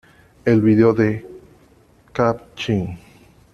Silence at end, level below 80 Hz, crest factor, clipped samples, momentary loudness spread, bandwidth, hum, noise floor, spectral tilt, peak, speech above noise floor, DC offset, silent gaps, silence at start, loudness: 0.55 s; -50 dBFS; 18 dB; under 0.1%; 16 LU; 7.2 kHz; none; -52 dBFS; -8 dB/octave; -2 dBFS; 35 dB; under 0.1%; none; 0.45 s; -19 LUFS